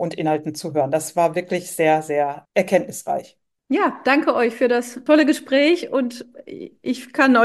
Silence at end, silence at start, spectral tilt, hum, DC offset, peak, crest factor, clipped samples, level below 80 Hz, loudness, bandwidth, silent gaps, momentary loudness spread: 0 s; 0 s; -4.5 dB/octave; none; under 0.1%; -2 dBFS; 18 dB; under 0.1%; -70 dBFS; -20 LUFS; 12.5 kHz; none; 11 LU